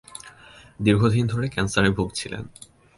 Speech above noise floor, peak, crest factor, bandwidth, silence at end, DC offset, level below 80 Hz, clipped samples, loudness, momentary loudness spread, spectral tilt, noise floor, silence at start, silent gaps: 27 dB; -4 dBFS; 20 dB; 11.5 kHz; 0.5 s; under 0.1%; -44 dBFS; under 0.1%; -23 LUFS; 21 LU; -5.5 dB/octave; -49 dBFS; 0.25 s; none